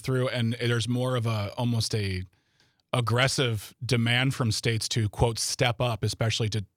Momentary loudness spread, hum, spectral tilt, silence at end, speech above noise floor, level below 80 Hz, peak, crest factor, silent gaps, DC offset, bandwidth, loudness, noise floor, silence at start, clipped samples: 6 LU; none; -4.5 dB/octave; 0.1 s; 41 dB; -52 dBFS; -8 dBFS; 18 dB; none; under 0.1%; 15.5 kHz; -27 LUFS; -67 dBFS; 0 s; under 0.1%